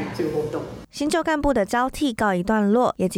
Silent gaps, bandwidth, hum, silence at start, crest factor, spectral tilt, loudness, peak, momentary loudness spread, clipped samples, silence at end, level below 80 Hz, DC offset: none; 16.5 kHz; none; 0 s; 14 dB; -5.5 dB/octave; -22 LUFS; -8 dBFS; 9 LU; under 0.1%; 0 s; -42 dBFS; under 0.1%